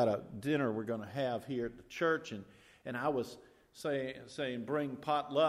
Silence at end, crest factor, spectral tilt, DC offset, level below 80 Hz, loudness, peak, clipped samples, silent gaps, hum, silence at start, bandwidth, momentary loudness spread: 0 s; 18 dB; -6 dB/octave; under 0.1%; -70 dBFS; -37 LUFS; -18 dBFS; under 0.1%; none; none; 0 s; 15.5 kHz; 10 LU